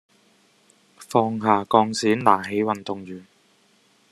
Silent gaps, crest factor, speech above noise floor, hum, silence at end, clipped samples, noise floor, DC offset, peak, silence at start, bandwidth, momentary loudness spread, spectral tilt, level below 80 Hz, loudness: none; 22 dB; 39 dB; none; 0.9 s; under 0.1%; -60 dBFS; under 0.1%; -2 dBFS; 1 s; 13 kHz; 15 LU; -5 dB/octave; -70 dBFS; -21 LUFS